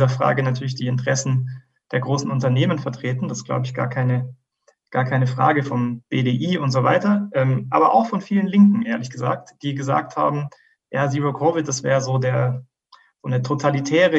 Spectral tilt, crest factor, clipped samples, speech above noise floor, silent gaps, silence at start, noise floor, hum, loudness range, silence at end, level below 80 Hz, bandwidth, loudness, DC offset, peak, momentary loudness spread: -6.5 dB/octave; 18 dB; under 0.1%; 43 dB; none; 0 s; -62 dBFS; none; 4 LU; 0 s; -66 dBFS; 8 kHz; -21 LUFS; under 0.1%; -2 dBFS; 9 LU